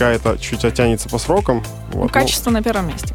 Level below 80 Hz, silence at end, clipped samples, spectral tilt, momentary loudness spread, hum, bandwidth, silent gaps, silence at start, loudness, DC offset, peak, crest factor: -28 dBFS; 0 s; under 0.1%; -5 dB/octave; 6 LU; none; 17 kHz; none; 0 s; -18 LUFS; under 0.1%; -2 dBFS; 16 dB